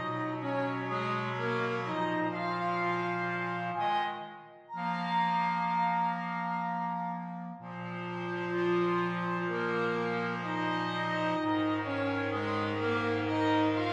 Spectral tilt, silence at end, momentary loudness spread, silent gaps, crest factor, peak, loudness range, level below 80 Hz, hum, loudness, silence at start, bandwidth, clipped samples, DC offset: -7 dB/octave; 0 s; 8 LU; none; 14 dB; -18 dBFS; 2 LU; -74 dBFS; none; -32 LUFS; 0 s; 9.8 kHz; under 0.1%; under 0.1%